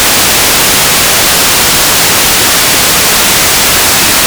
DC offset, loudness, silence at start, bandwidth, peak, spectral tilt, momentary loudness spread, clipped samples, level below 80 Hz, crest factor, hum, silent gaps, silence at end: under 0.1%; -4 LUFS; 0 s; over 20 kHz; 0 dBFS; -0.5 dB/octave; 0 LU; 9%; -30 dBFS; 6 dB; none; none; 0 s